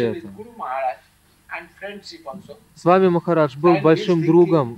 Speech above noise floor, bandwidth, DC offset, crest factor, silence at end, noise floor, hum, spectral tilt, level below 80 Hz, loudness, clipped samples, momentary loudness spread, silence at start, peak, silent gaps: 37 dB; 8.6 kHz; under 0.1%; 18 dB; 0 s; -56 dBFS; 50 Hz at -55 dBFS; -8 dB/octave; -60 dBFS; -18 LUFS; under 0.1%; 21 LU; 0 s; -2 dBFS; none